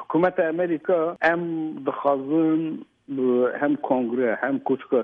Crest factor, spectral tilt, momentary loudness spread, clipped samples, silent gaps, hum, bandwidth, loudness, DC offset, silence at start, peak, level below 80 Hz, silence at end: 16 dB; -9 dB/octave; 7 LU; under 0.1%; none; none; 5.4 kHz; -23 LUFS; under 0.1%; 0 s; -8 dBFS; -70 dBFS; 0 s